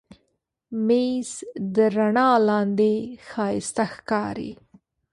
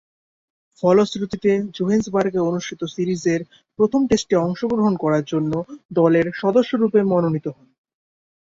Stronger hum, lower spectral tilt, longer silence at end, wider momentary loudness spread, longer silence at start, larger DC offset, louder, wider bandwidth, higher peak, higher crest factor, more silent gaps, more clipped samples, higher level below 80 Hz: neither; about the same, -5.5 dB/octave vs -6.5 dB/octave; second, 0.6 s vs 0.95 s; first, 15 LU vs 8 LU; second, 0.7 s vs 0.85 s; neither; second, -23 LUFS vs -20 LUFS; first, 11.5 kHz vs 7.8 kHz; about the same, -6 dBFS vs -4 dBFS; about the same, 18 dB vs 16 dB; second, none vs 5.85-5.89 s; neither; second, -62 dBFS vs -54 dBFS